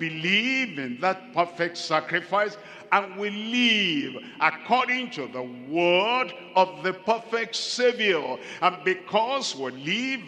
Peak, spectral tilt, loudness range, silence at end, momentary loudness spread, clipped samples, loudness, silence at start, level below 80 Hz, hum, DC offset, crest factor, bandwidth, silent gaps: -6 dBFS; -3.5 dB/octave; 2 LU; 0 s; 9 LU; under 0.1%; -25 LUFS; 0 s; -80 dBFS; none; under 0.1%; 20 dB; 10.5 kHz; none